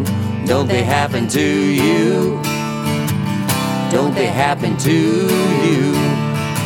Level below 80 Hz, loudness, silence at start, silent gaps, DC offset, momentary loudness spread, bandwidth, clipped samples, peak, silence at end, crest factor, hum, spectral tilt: -50 dBFS; -16 LUFS; 0 s; none; under 0.1%; 5 LU; 19 kHz; under 0.1%; -2 dBFS; 0 s; 14 dB; none; -5.5 dB/octave